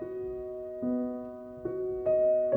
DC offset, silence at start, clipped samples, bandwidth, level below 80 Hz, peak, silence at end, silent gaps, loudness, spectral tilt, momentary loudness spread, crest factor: under 0.1%; 0 s; under 0.1%; 2.7 kHz; -60 dBFS; -16 dBFS; 0 s; none; -32 LUFS; -10.5 dB/octave; 14 LU; 14 dB